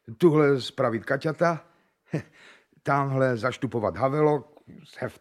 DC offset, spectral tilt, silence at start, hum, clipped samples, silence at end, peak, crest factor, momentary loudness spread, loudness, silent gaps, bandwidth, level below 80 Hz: under 0.1%; -7.5 dB/octave; 0.1 s; none; under 0.1%; 0.1 s; -8 dBFS; 18 dB; 13 LU; -25 LUFS; none; 14 kHz; -66 dBFS